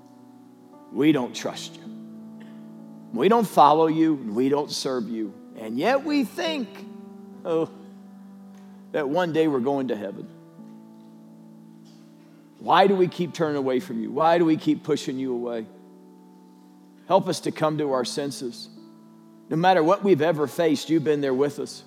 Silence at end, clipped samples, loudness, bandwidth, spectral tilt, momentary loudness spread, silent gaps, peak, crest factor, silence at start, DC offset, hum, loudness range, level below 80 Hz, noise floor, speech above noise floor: 0.05 s; under 0.1%; -23 LUFS; 15.5 kHz; -5.5 dB/octave; 22 LU; none; -4 dBFS; 22 dB; 0.9 s; under 0.1%; none; 6 LU; under -90 dBFS; -50 dBFS; 28 dB